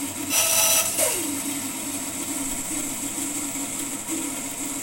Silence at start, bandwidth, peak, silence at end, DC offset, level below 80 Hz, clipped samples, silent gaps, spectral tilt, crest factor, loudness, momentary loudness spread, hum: 0 s; 16.5 kHz; -6 dBFS; 0 s; under 0.1%; -54 dBFS; under 0.1%; none; -1 dB/octave; 20 dB; -23 LUFS; 10 LU; none